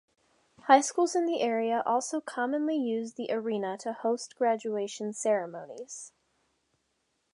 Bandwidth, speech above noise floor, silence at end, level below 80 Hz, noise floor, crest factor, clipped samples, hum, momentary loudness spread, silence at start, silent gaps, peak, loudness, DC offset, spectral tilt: 11.5 kHz; 48 dB; 1.25 s; -84 dBFS; -77 dBFS; 24 dB; under 0.1%; none; 18 LU; 0.65 s; none; -6 dBFS; -29 LUFS; under 0.1%; -3.5 dB/octave